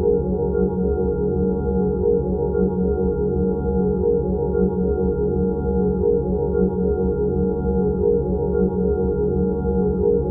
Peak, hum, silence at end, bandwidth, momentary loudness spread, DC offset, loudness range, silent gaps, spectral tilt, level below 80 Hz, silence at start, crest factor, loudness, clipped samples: -8 dBFS; none; 0 s; 1.5 kHz; 2 LU; under 0.1%; 0 LU; none; -14.5 dB/octave; -30 dBFS; 0 s; 12 dB; -21 LUFS; under 0.1%